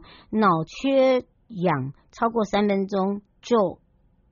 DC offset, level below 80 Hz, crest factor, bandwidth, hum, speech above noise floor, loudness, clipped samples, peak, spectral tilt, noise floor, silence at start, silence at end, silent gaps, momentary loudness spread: under 0.1%; -58 dBFS; 16 dB; 7.2 kHz; none; 39 dB; -23 LUFS; under 0.1%; -8 dBFS; -5.5 dB/octave; -61 dBFS; 0.3 s; 0.55 s; none; 9 LU